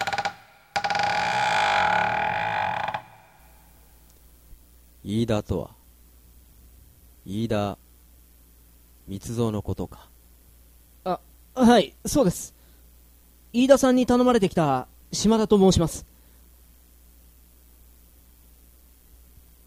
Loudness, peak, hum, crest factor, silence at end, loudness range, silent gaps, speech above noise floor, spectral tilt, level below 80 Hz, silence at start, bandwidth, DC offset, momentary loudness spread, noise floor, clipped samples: -23 LUFS; -2 dBFS; none; 24 dB; 3.65 s; 13 LU; none; 32 dB; -5 dB/octave; -48 dBFS; 0 s; 16.5 kHz; under 0.1%; 17 LU; -54 dBFS; under 0.1%